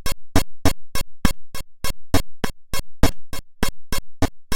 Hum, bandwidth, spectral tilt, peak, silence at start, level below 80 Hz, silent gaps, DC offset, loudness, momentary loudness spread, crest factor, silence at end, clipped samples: none; 17 kHz; -4.5 dB/octave; 0 dBFS; 0 s; -28 dBFS; none; under 0.1%; -26 LUFS; 8 LU; 18 dB; 0 s; under 0.1%